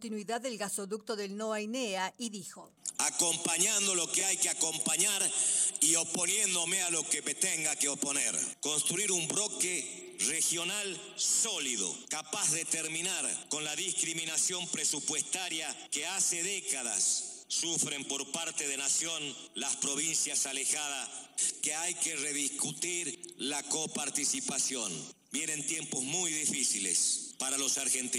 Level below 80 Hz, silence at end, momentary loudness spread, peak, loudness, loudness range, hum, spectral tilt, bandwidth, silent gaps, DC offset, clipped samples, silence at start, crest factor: -86 dBFS; 0 s; 9 LU; -14 dBFS; -30 LUFS; 5 LU; none; -0.5 dB/octave; 16.5 kHz; none; under 0.1%; under 0.1%; 0 s; 18 dB